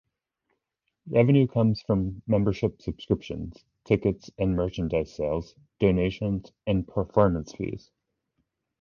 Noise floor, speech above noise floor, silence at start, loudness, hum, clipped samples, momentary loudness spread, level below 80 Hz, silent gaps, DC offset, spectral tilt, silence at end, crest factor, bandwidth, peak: -81 dBFS; 56 dB; 1.05 s; -26 LUFS; none; under 0.1%; 13 LU; -44 dBFS; none; under 0.1%; -8.5 dB/octave; 1.05 s; 20 dB; 7 kHz; -6 dBFS